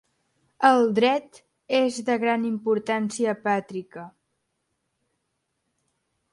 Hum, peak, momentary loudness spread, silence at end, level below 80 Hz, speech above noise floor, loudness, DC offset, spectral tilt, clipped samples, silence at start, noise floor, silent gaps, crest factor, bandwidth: none; -4 dBFS; 14 LU; 2.25 s; -74 dBFS; 54 dB; -23 LUFS; under 0.1%; -4.5 dB/octave; under 0.1%; 0.6 s; -77 dBFS; none; 22 dB; 11.5 kHz